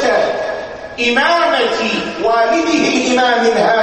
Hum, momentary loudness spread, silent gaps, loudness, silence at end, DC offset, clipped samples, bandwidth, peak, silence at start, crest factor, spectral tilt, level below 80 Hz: none; 8 LU; none; -14 LUFS; 0 s; under 0.1%; under 0.1%; 9 kHz; -2 dBFS; 0 s; 12 dB; -3 dB/octave; -50 dBFS